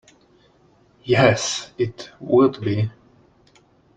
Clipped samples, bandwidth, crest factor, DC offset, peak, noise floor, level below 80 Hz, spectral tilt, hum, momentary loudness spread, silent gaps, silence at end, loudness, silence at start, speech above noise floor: under 0.1%; 9.2 kHz; 20 dB; under 0.1%; -4 dBFS; -57 dBFS; -56 dBFS; -5 dB/octave; none; 12 LU; none; 1.1 s; -20 LUFS; 1.05 s; 37 dB